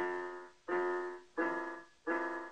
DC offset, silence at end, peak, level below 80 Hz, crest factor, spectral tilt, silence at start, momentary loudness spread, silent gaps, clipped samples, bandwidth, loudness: under 0.1%; 0 s; -24 dBFS; -80 dBFS; 16 dB; -5 dB/octave; 0 s; 10 LU; none; under 0.1%; 9 kHz; -39 LUFS